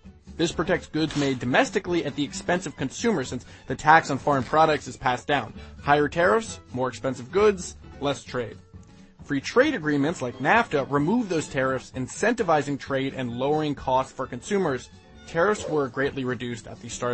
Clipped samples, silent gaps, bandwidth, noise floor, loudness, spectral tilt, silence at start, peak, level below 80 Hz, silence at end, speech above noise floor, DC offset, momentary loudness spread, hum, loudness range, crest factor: under 0.1%; none; 8.8 kHz; -48 dBFS; -25 LUFS; -5 dB/octave; 0.05 s; -2 dBFS; -50 dBFS; 0 s; 23 dB; under 0.1%; 12 LU; none; 4 LU; 22 dB